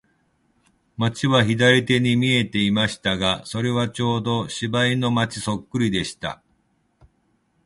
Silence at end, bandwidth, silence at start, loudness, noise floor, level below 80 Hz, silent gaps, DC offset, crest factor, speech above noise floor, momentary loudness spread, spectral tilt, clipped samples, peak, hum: 1.3 s; 11.5 kHz; 1 s; -21 LUFS; -66 dBFS; -50 dBFS; none; under 0.1%; 20 dB; 45 dB; 10 LU; -5 dB/octave; under 0.1%; -2 dBFS; none